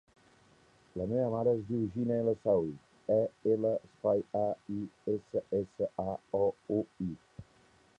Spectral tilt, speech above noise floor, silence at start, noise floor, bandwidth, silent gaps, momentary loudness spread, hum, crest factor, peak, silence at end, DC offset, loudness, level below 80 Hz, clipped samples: -10 dB/octave; 32 dB; 0.95 s; -65 dBFS; 8.6 kHz; none; 10 LU; none; 16 dB; -18 dBFS; 0.55 s; under 0.1%; -33 LUFS; -64 dBFS; under 0.1%